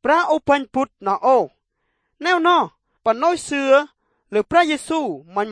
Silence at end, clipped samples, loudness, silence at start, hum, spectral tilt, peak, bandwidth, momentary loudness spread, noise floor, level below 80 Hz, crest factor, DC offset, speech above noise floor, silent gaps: 0 s; under 0.1%; -19 LUFS; 0.05 s; none; -4 dB/octave; -2 dBFS; 10.5 kHz; 9 LU; -72 dBFS; -58 dBFS; 18 dB; under 0.1%; 54 dB; none